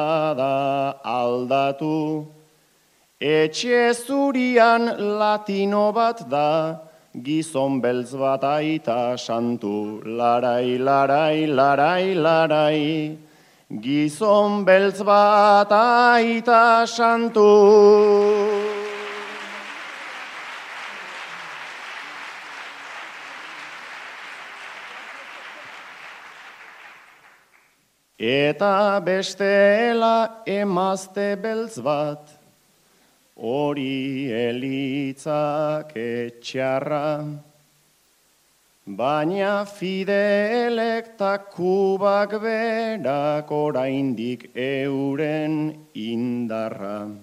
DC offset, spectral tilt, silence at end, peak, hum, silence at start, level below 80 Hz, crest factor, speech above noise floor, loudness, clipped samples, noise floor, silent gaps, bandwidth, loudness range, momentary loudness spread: under 0.1%; -5.5 dB/octave; 0.05 s; -2 dBFS; none; 0 s; -74 dBFS; 20 dB; 44 dB; -20 LUFS; under 0.1%; -63 dBFS; none; 14 kHz; 18 LU; 19 LU